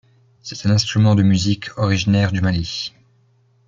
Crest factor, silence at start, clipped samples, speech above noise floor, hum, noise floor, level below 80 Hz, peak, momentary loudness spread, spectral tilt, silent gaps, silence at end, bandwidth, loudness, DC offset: 14 dB; 0.45 s; under 0.1%; 40 dB; none; -57 dBFS; -48 dBFS; -4 dBFS; 13 LU; -6 dB/octave; none; 0.8 s; 7.6 kHz; -18 LUFS; under 0.1%